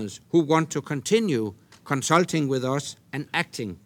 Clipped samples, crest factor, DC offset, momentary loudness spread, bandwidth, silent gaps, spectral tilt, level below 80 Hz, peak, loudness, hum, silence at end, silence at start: under 0.1%; 20 dB; under 0.1%; 10 LU; 17.5 kHz; none; -5 dB/octave; -68 dBFS; -6 dBFS; -25 LUFS; none; 0.1 s; 0 s